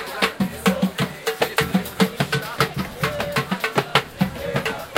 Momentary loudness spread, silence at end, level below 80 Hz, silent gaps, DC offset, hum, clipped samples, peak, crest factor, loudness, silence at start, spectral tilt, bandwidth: 5 LU; 0 s; -46 dBFS; none; under 0.1%; none; under 0.1%; 0 dBFS; 22 dB; -22 LUFS; 0 s; -4.5 dB/octave; 17 kHz